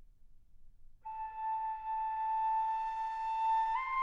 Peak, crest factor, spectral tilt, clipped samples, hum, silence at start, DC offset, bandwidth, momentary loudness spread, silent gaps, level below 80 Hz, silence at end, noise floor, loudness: -24 dBFS; 12 dB; -1.5 dB/octave; under 0.1%; none; 0 s; under 0.1%; 7.6 kHz; 11 LU; none; -60 dBFS; 0 s; -57 dBFS; -35 LUFS